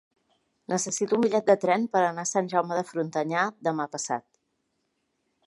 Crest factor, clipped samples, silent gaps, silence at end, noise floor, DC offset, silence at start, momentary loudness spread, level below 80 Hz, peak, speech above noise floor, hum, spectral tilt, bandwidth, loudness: 20 dB; under 0.1%; none; 1.25 s; -76 dBFS; under 0.1%; 0.7 s; 8 LU; -80 dBFS; -6 dBFS; 50 dB; none; -4 dB/octave; 11.5 kHz; -26 LUFS